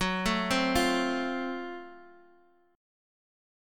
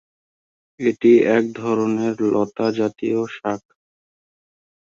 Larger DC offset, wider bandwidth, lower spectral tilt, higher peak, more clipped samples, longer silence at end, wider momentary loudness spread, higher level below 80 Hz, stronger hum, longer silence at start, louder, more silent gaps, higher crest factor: neither; first, 17.5 kHz vs 7.4 kHz; second, -4 dB/octave vs -7 dB/octave; second, -12 dBFS vs -4 dBFS; neither; second, 0.95 s vs 1.3 s; first, 16 LU vs 11 LU; first, -50 dBFS vs -64 dBFS; neither; second, 0 s vs 0.8 s; second, -29 LUFS vs -19 LUFS; neither; about the same, 20 dB vs 18 dB